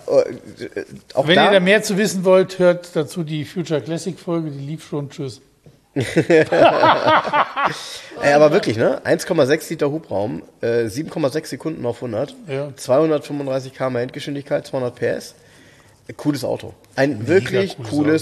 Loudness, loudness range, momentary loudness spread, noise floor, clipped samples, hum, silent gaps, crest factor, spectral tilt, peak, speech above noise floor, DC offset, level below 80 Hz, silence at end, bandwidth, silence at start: -19 LUFS; 9 LU; 15 LU; -49 dBFS; under 0.1%; none; none; 18 dB; -5.5 dB/octave; -2 dBFS; 30 dB; under 0.1%; -58 dBFS; 0 s; 13 kHz; 0.05 s